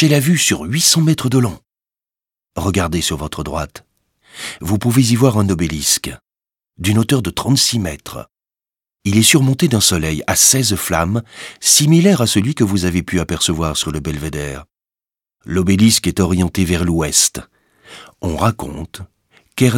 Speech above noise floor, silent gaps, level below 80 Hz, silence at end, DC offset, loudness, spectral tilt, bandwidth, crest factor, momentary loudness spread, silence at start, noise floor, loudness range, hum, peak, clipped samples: over 75 dB; none; -38 dBFS; 0 s; under 0.1%; -15 LUFS; -4 dB/octave; 18 kHz; 16 dB; 17 LU; 0 s; under -90 dBFS; 6 LU; none; 0 dBFS; under 0.1%